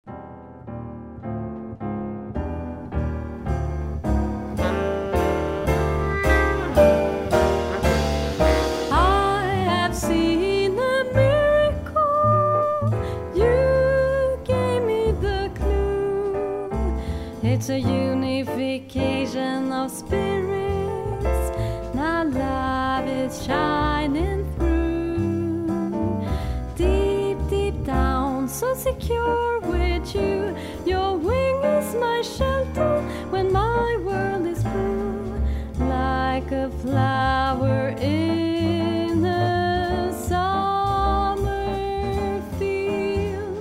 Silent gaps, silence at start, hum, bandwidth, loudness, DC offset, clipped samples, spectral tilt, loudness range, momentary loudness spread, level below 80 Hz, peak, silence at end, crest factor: none; 0.05 s; none; 16 kHz; -23 LUFS; under 0.1%; under 0.1%; -6.5 dB/octave; 5 LU; 8 LU; -30 dBFS; -4 dBFS; 0 s; 18 dB